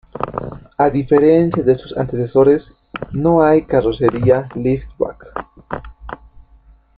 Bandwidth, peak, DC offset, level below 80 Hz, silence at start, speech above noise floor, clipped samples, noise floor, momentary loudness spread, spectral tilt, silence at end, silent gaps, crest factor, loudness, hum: 5 kHz; -2 dBFS; under 0.1%; -40 dBFS; 0.15 s; 34 dB; under 0.1%; -48 dBFS; 18 LU; -10.5 dB/octave; 0.85 s; none; 14 dB; -16 LUFS; none